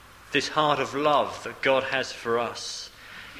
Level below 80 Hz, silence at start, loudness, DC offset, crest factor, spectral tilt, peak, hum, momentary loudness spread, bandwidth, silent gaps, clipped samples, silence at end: -60 dBFS; 0 s; -26 LUFS; under 0.1%; 20 dB; -3.5 dB/octave; -8 dBFS; none; 11 LU; 15.5 kHz; none; under 0.1%; 0 s